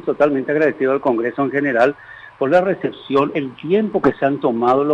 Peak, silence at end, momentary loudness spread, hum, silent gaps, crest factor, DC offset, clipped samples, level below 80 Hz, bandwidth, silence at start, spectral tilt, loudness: -4 dBFS; 0 s; 7 LU; none; none; 14 dB; under 0.1%; under 0.1%; -56 dBFS; 7.8 kHz; 0.05 s; -8 dB/octave; -18 LUFS